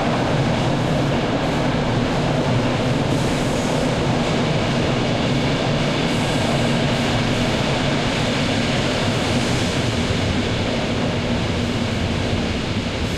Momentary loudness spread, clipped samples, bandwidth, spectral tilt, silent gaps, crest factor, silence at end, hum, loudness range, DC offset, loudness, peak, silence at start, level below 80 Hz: 2 LU; under 0.1%; 13.5 kHz; -5.5 dB/octave; none; 14 dB; 0 s; none; 1 LU; under 0.1%; -20 LUFS; -6 dBFS; 0 s; -34 dBFS